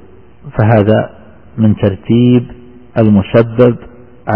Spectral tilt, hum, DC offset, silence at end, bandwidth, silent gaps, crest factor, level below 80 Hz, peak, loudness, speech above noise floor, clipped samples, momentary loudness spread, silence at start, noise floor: -11.5 dB/octave; none; 0.7%; 0 s; 4.2 kHz; none; 12 dB; -40 dBFS; 0 dBFS; -11 LUFS; 25 dB; 0.1%; 16 LU; 0.45 s; -35 dBFS